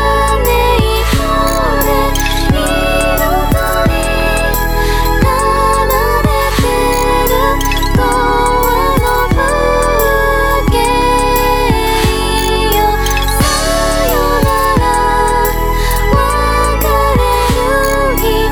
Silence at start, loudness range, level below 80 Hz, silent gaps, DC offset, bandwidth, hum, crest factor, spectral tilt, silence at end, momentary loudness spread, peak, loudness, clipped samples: 0 s; 1 LU; -16 dBFS; none; under 0.1%; over 20 kHz; none; 10 dB; -4.5 dB/octave; 0 s; 2 LU; 0 dBFS; -12 LUFS; under 0.1%